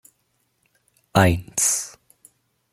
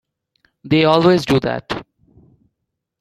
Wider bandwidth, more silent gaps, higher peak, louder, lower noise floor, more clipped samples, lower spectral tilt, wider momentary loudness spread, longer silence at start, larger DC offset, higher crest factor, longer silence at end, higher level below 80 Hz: first, 16.5 kHz vs 13.5 kHz; neither; about the same, -2 dBFS vs -2 dBFS; second, -20 LUFS vs -16 LUFS; second, -70 dBFS vs -77 dBFS; neither; second, -4 dB/octave vs -6.5 dB/octave; second, 7 LU vs 15 LU; first, 1.15 s vs 0.65 s; neither; first, 24 dB vs 18 dB; second, 0.85 s vs 1.2 s; about the same, -48 dBFS vs -48 dBFS